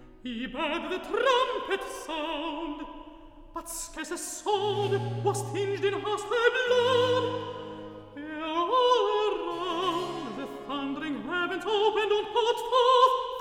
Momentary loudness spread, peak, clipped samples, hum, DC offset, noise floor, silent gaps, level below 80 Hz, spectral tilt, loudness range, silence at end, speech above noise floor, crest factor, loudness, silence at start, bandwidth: 15 LU; -8 dBFS; under 0.1%; none; under 0.1%; -48 dBFS; none; -56 dBFS; -4 dB/octave; 5 LU; 0 s; 21 dB; 20 dB; -28 LUFS; 0 s; 16.5 kHz